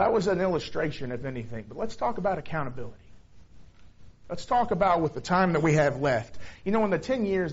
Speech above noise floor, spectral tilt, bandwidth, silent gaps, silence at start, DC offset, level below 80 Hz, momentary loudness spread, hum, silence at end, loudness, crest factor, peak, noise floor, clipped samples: 22 dB; -5.5 dB/octave; 8 kHz; none; 0 s; under 0.1%; -50 dBFS; 14 LU; none; 0 s; -27 LUFS; 18 dB; -10 dBFS; -49 dBFS; under 0.1%